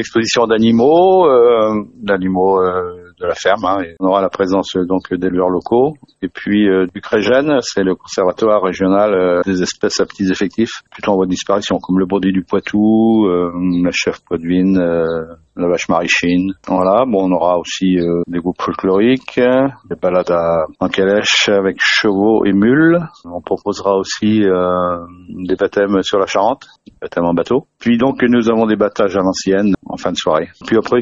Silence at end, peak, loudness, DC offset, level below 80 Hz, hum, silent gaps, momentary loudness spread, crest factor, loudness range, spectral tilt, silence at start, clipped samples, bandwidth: 0 s; 0 dBFS; -14 LUFS; under 0.1%; -48 dBFS; none; none; 8 LU; 14 dB; 3 LU; -5.5 dB/octave; 0 s; under 0.1%; 8 kHz